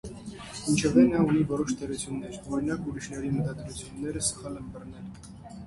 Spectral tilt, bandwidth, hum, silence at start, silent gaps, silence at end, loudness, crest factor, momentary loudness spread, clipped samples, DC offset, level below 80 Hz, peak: -5.5 dB/octave; 11.5 kHz; none; 0.05 s; none; 0 s; -28 LUFS; 20 dB; 20 LU; under 0.1%; under 0.1%; -50 dBFS; -8 dBFS